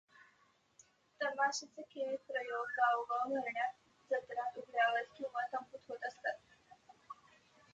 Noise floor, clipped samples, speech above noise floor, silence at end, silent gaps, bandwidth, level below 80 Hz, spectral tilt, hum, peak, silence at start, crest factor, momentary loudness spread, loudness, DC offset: -73 dBFS; under 0.1%; 34 dB; 0.6 s; none; 8.6 kHz; -88 dBFS; -1.5 dB/octave; none; -20 dBFS; 0.2 s; 20 dB; 16 LU; -38 LUFS; under 0.1%